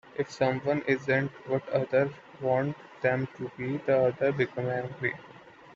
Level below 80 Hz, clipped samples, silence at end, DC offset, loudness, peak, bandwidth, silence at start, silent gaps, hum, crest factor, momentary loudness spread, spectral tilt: -68 dBFS; under 0.1%; 0.05 s; under 0.1%; -29 LUFS; -10 dBFS; 7.6 kHz; 0.15 s; none; none; 18 dB; 9 LU; -7.5 dB/octave